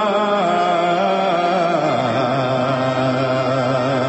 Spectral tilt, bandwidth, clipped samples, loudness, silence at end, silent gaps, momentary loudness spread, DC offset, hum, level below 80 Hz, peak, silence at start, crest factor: -6.5 dB/octave; 8.4 kHz; under 0.1%; -18 LUFS; 0 s; none; 2 LU; under 0.1%; none; -56 dBFS; -6 dBFS; 0 s; 12 dB